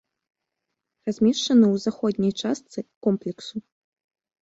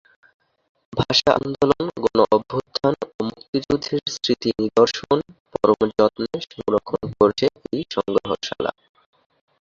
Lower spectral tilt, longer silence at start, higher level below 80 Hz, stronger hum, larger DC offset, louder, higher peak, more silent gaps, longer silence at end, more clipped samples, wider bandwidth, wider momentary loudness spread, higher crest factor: about the same, -6 dB/octave vs -5 dB/octave; first, 1.05 s vs 0.9 s; second, -64 dBFS vs -52 dBFS; neither; neither; about the same, -23 LUFS vs -21 LUFS; second, -8 dBFS vs -2 dBFS; second, 2.96-3.01 s vs 3.14-3.19 s, 3.48-3.53 s, 5.40-5.45 s; about the same, 0.8 s vs 0.9 s; neither; about the same, 8 kHz vs 7.6 kHz; first, 17 LU vs 10 LU; about the same, 18 dB vs 20 dB